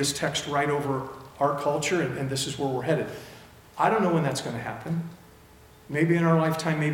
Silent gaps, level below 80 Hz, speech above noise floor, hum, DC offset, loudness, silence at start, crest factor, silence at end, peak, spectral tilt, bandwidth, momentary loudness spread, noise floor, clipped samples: none; -60 dBFS; 26 dB; none; under 0.1%; -26 LUFS; 0 s; 18 dB; 0 s; -8 dBFS; -5 dB/octave; 17 kHz; 12 LU; -52 dBFS; under 0.1%